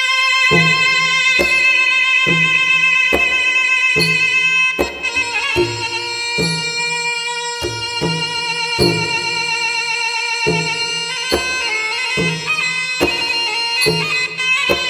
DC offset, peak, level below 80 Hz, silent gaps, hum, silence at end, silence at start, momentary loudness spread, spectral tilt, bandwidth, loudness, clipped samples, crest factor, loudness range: under 0.1%; 0 dBFS; -44 dBFS; none; none; 0 s; 0 s; 7 LU; -2.5 dB/octave; 16.5 kHz; -14 LUFS; under 0.1%; 16 dB; 6 LU